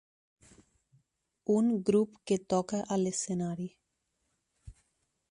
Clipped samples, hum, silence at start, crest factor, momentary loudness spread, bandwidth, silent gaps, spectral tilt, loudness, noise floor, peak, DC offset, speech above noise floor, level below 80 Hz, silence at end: under 0.1%; none; 1.5 s; 20 dB; 11 LU; 11 kHz; none; -6 dB/octave; -31 LUFS; -81 dBFS; -14 dBFS; under 0.1%; 51 dB; -66 dBFS; 0.6 s